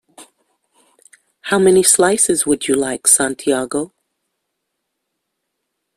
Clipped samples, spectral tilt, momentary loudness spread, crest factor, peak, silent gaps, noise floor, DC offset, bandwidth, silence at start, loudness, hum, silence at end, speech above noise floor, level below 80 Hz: under 0.1%; -2.5 dB/octave; 13 LU; 18 dB; 0 dBFS; none; -75 dBFS; under 0.1%; 15.5 kHz; 0.2 s; -14 LUFS; none; 2.1 s; 61 dB; -56 dBFS